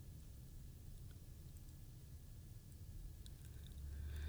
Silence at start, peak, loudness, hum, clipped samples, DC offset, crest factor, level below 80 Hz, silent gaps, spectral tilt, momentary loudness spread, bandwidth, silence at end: 0 s; -38 dBFS; -57 LUFS; none; under 0.1%; under 0.1%; 14 dB; -56 dBFS; none; -5.5 dB/octave; 5 LU; over 20 kHz; 0 s